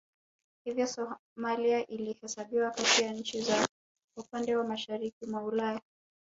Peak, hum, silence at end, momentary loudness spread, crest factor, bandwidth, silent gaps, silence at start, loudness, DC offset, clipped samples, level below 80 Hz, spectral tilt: -12 dBFS; none; 0.5 s; 13 LU; 20 dB; 8 kHz; 1.19-1.36 s, 3.69-3.95 s, 4.04-4.08 s, 5.13-5.21 s; 0.65 s; -32 LUFS; under 0.1%; under 0.1%; -74 dBFS; -2 dB/octave